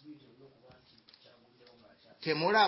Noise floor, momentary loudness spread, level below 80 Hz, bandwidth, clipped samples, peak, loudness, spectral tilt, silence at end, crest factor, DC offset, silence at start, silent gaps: -62 dBFS; 28 LU; -82 dBFS; 5.8 kHz; under 0.1%; -14 dBFS; -32 LUFS; -7.5 dB/octave; 0 s; 22 dB; under 0.1%; 0.05 s; none